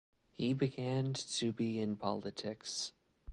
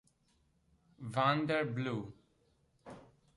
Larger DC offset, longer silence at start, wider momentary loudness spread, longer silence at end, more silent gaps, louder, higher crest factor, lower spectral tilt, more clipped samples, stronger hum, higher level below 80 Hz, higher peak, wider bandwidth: neither; second, 0.4 s vs 1 s; second, 6 LU vs 23 LU; second, 0 s vs 0.35 s; neither; second, -38 LUFS vs -35 LUFS; about the same, 20 dB vs 22 dB; second, -5 dB/octave vs -7 dB/octave; neither; neither; first, -64 dBFS vs -72 dBFS; about the same, -18 dBFS vs -18 dBFS; about the same, 11.5 kHz vs 11.5 kHz